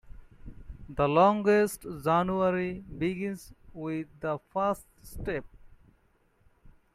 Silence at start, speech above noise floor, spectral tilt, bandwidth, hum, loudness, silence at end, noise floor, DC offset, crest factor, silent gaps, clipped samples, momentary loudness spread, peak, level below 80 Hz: 0.05 s; 39 dB; -6.5 dB/octave; 15.5 kHz; none; -29 LUFS; 0.25 s; -67 dBFS; under 0.1%; 20 dB; none; under 0.1%; 18 LU; -10 dBFS; -52 dBFS